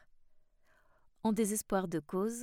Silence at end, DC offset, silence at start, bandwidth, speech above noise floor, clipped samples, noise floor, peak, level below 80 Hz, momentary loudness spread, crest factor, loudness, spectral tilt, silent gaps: 0 s; under 0.1%; 1.25 s; 18 kHz; 33 dB; under 0.1%; -67 dBFS; -18 dBFS; -62 dBFS; 5 LU; 18 dB; -35 LUFS; -5 dB/octave; none